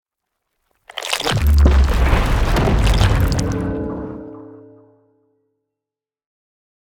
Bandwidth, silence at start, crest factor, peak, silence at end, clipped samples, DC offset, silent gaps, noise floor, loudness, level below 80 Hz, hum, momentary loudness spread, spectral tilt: 17.5 kHz; 0.95 s; 18 dB; 0 dBFS; 2.3 s; under 0.1%; under 0.1%; none; -87 dBFS; -17 LUFS; -20 dBFS; none; 17 LU; -5.5 dB/octave